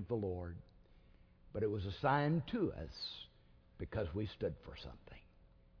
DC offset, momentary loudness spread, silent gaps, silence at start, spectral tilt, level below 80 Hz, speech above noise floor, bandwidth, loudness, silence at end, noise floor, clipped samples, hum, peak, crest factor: under 0.1%; 20 LU; none; 0 s; -5.5 dB/octave; -58 dBFS; 26 dB; 5.4 kHz; -40 LUFS; 0.35 s; -65 dBFS; under 0.1%; none; -22 dBFS; 20 dB